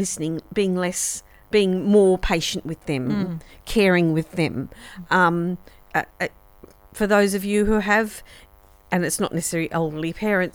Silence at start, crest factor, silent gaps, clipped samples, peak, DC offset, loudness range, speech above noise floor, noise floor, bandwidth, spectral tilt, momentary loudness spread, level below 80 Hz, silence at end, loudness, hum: 0 s; 18 dB; none; under 0.1%; -4 dBFS; under 0.1%; 2 LU; 27 dB; -49 dBFS; over 20 kHz; -4.5 dB/octave; 12 LU; -42 dBFS; 0.05 s; -22 LUFS; none